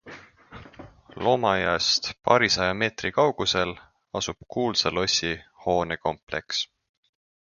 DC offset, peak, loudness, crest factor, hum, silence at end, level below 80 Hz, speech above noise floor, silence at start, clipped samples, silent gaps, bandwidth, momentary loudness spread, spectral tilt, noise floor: under 0.1%; -2 dBFS; -24 LUFS; 24 dB; none; 0.85 s; -52 dBFS; 22 dB; 0.05 s; under 0.1%; 6.23-6.27 s; 7.4 kHz; 10 LU; -3 dB/octave; -47 dBFS